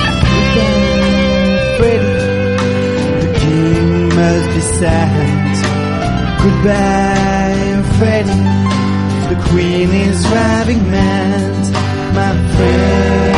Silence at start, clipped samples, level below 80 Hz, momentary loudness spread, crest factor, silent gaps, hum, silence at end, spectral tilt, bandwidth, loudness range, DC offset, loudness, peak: 0 s; under 0.1%; -24 dBFS; 4 LU; 12 dB; none; none; 0 s; -6 dB/octave; 11.5 kHz; 0 LU; 1%; -12 LUFS; 0 dBFS